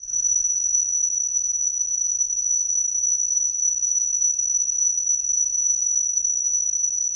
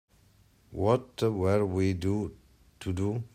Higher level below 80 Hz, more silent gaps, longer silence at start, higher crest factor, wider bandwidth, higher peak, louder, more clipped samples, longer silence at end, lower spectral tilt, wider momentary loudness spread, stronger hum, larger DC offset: about the same, -58 dBFS vs -58 dBFS; neither; second, 0 s vs 0.7 s; second, 12 dB vs 18 dB; second, 9.8 kHz vs 15 kHz; about the same, -10 dBFS vs -12 dBFS; first, -19 LUFS vs -29 LUFS; neither; about the same, 0 s vs 0.1 s; second, 3 dB/octave vs -7.5 dB/octave; second, 2 LU vs 12 LU; neither; neither